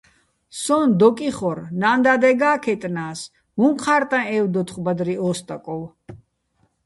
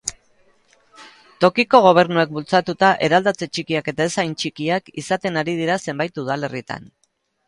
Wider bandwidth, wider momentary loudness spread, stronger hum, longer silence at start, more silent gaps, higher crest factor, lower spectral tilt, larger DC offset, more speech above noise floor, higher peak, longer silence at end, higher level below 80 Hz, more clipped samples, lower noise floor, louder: about the same, 11.5 kHz vs 11.5 kHz; first, 15 LU vs 12 LU; neither; first, 0.55 s vs 0.05 s; neither; about the same, 18 dB vs 20 dB; about the same, -5.5 dB/octave vs -4.5 dB/octave; neither; first, 46 dB vs 39 dB; about the same, -2 dBFS vs 0 dBFS; about the same, 0.7 s vs 0.65 s; about the same, -60 dBFS vs -60 dBFS; neither; first, -66 dBFS vs -58 dBFS; about the same, -20 LUFS vs -19 LUFS